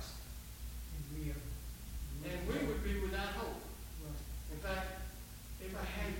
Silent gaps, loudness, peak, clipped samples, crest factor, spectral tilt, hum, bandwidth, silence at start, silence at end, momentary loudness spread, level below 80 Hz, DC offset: none; -43 LUFS; -26 dBFS; under 0.1%; 16 dB; -5 dB/octave; none; 17 kHz; 0 s; 0 s; 11 LU; -46 dBFS; under 0.1%